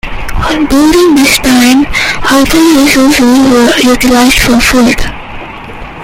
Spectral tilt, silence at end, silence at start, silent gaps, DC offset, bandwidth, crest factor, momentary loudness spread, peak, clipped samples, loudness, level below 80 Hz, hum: -3.5 dB/octave; 0 s; 0.05 s; none; under 0.1%; 17 kHz; 6 dB; 16 LU; 0 dBFS; 0.4%; -6 LUFS; -22 dBFS; none